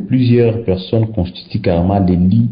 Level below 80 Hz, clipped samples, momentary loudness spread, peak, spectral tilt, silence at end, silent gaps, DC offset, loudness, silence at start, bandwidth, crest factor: -30 dBFS; under 0.1%; 8 LU; -2 dBFS; -14 dB/octave; 0 s; none; under 0.1%; -14 LUFS; 0 s; 5.2 kHz; 10 dB